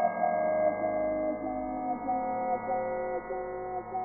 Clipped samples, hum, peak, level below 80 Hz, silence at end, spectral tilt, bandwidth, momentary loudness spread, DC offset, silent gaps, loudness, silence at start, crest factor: under 0.1%; none; -14 dBFS; -58 dBFS; 0 s; -1 dB/octave; 2.4 kHz; 8 LU; under 0.1%; none; -31 LUFS; 0 s; 16 dB